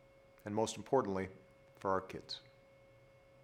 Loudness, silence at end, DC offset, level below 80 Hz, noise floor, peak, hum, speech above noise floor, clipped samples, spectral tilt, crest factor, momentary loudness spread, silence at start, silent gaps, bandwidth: -39 LUFS; 1.05 s; under 0.1%; -74 dBFS; -64 dBFS; -18 dBFS; none; 26 dB; under 0.1%; -5 dB/octave; 22 dB; 13 LU; 0.45 s; none; 16 kHz